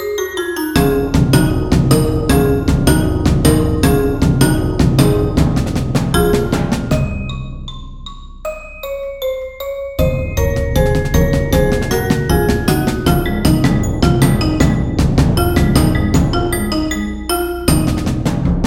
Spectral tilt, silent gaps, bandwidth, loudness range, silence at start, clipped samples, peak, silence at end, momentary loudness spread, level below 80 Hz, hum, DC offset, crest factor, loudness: -6 dB/octave; none; over 20 kHz; 7 LU; 0 s; under 0.1%; 0 dBFS; 0 s; 11 LU; -22 dBFS; none; under 0.1%; 14 dB; -15 LUFS